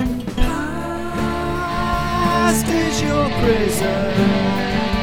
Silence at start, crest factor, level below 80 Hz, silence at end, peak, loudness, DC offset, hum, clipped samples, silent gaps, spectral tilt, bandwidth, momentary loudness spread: 0 s; 16 dB; -28 dBFS; 0 s; -2 dBFS; -19 LUFS; under 0.1%; none; under 0.1%; none; -5 dB/octave; 18.5 kHz; 6 LU